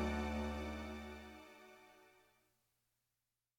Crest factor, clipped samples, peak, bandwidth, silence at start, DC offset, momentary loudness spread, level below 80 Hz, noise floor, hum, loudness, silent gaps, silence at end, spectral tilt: 18 dB; under 0.1%; -30 dBFS; 17.5 kHz; 0 s; under 0.1%; 22 LU; -54 dBFS; under -90 dBFS; none; -45 LUFS; none; 1.5 s; -6 dB/octave